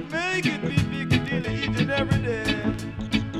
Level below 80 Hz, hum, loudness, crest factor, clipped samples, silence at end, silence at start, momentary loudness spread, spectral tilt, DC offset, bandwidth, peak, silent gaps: -40 dBFS; none; -25 LUFS; 18 dB; under 0.1%; 0 s; 0 s; 4 LU; -6 dB/octave; under 0.1%; 14 kHz; -8 dBFS; none